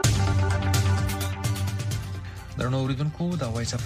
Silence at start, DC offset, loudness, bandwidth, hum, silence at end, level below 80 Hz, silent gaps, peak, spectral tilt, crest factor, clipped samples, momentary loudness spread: 0 s; under 0.1%; -26 LUFS; 15.5 kHz; none; 0 s; -40 dBFS; none; -6 dBFS; -5 dB/octave; 18 dB; under 0.1%; 8 LU